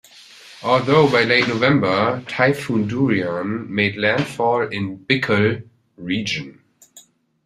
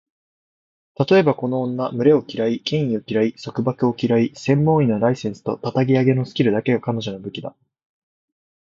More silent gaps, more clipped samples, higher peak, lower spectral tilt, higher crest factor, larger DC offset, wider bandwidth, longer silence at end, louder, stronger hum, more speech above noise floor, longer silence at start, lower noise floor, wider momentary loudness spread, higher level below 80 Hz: neither; neither; about the same, -2 dBFS vs -2 dBFS; second, -6 dB/octave vs -7.5 dB/octave; about the same, 18 dB vs 18 dB; neither; first, 14.5 kHz vs 7.6 kHz; second, 0.45 s vs 1.25 s; about the same, -19 LUFS vs -20 LUFS; neither; second, 32 dB vs over 71 dB; second, 0.45 s vs 1 s; second, -50 dBFS vs under -90 dBFS; about the same, 11 LU vs 10 LU; about the same, -56 dBFS vs -58 dBFS